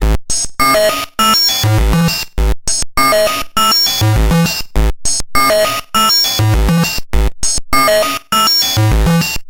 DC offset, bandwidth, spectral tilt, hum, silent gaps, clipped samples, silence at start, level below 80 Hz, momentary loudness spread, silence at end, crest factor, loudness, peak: under 0.1%; 17 kHz; -3.5 dB/octave; none; none; under 0.1%; 0 s; -20 dBFS; 7 LU; 0 s; 12 dB; -12 LUFS; 0 dBFS